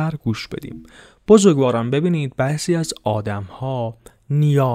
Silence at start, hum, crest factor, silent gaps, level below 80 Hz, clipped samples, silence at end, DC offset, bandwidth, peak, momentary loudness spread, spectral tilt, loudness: 0 s; none; 18 dB; none; -50 dBFS; under 0.1%; 0 s; under 0.1%; 15 kHz; 0 dBFS; 18 LU; -6.5 dB/octave; -19 LUFS